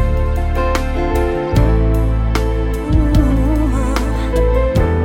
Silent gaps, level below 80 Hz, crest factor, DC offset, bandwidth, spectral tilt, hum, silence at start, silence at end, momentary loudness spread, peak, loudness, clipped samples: none; -16 dBFS; 14 dB; under 0.1%; 16 kHz; -7.5 dB/octave; none; 0 s; 0 s; 4 LU; 0 dBFS; -16 LUFS; under 0.1%